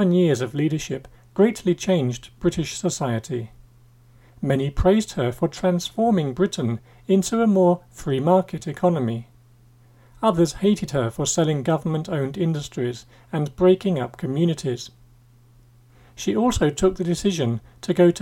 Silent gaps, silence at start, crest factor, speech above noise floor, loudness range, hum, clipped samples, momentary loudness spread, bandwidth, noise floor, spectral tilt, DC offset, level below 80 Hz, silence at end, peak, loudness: none; 0 s; 18 dB; 31 dB; 3 LU; none; under 0.1%; 11 LU; 16.5 kHz; -53 dBFS; -6 dB/octave; under 0.1%; -42 dBFS; 0 s; -4 dBFS; -22 LUFS